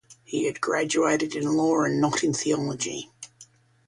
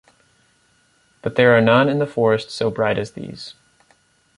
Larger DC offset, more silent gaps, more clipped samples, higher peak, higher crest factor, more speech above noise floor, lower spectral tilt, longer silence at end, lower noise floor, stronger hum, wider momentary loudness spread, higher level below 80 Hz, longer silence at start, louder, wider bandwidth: neither; neither; neither; second, -10 dBFS vs -2 dBFS; about the same, 16 dB vs 18 dB; second, 30 dB vs 42 dB; second, -4 dB/octave vs -6.5 dB/octave; second, 0.45 s vs 0.85 s; second, -55 dBFS vs -60 dBFS; neither; second, 13 LU vs 19 LU; second, -64 dBFS vs -56 dBFS; second, 0.1 s vs 1.25 s; second, -25 LUFS vs -18 LUFS; about the same, 11.5 kHz vs 11 kHz